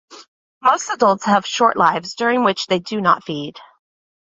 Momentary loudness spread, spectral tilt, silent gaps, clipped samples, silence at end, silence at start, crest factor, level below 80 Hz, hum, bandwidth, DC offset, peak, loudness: 6 LU; -4 dB/octave; 0.28-0.61 s; under 0.1%; 0.55 s; 0.1 s; 18 dB; -64 dBFS; none; 8.2 kHz; under 0.1%; 0 dBFS; -17 LUFS